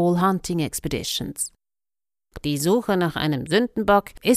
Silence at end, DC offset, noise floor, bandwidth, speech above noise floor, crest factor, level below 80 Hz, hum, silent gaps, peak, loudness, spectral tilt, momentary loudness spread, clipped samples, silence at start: 0 s; under 0.1%; under -90 dBFS; 15.5 kHz; over 68 dB; 18 dB; -46 dBFS; none; none; -4 dBFS; -23 LUFS; -5 dB/octave; 8 LU; under 0.1%; 0 s